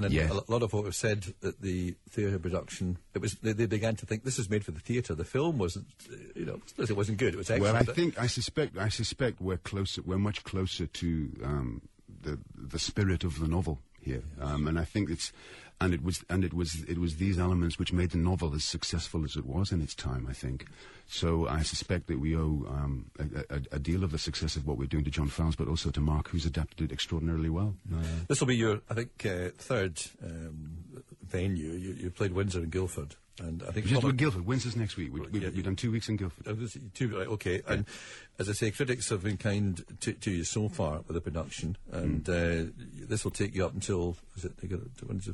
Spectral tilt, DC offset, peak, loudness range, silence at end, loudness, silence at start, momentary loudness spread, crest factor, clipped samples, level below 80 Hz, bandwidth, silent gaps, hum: -5.5 dB/octave; under 0.1%; -6 dBFS; 3 LU; 0 s; -33 LUFS; 0 s; 10 LU; 26 dB; under 0.1%; -44 dBFS; 11.5 kHz; none; none